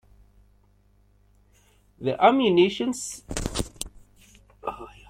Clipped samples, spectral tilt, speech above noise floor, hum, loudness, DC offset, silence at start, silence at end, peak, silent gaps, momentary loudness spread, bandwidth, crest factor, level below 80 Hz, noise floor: under 0.1%; -4.5 dB/octave; 39 dB; 50 Hz at -55 dBFS; -24 LUFS; under 0.1%; 2 s; 0.2 s; -4 dBFS; none; 17 LU; 16 kHz; 22 dB; -46 dBFS; -61 dBFS